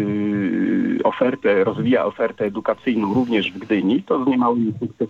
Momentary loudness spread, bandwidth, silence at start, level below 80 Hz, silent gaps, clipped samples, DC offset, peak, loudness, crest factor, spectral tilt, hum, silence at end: 4 LU; 7 kHz; 0 s; -62 dBFS; none; under 0.1%; under 0.1%; -6 dBFS; -20 LUFS; 14 dB; -8 dB/octave; none; 0 s